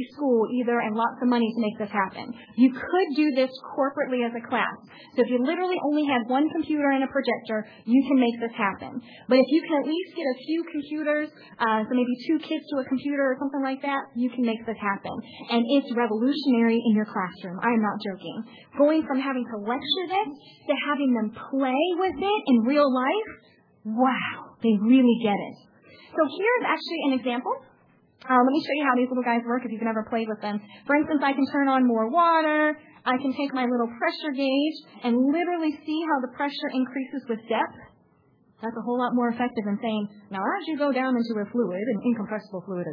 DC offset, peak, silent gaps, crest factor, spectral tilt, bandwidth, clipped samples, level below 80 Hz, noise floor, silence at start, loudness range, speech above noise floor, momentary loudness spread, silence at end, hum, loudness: under 0.1%; -6 dBFS; none; 18 dB; -8 dB/octave; 5.2 kHz; under 0.1%; -72 dBFS; -62 dBFS; 0 s; 4 LU; 37 dB; 10 LU; 0 s; none; -25 LUFS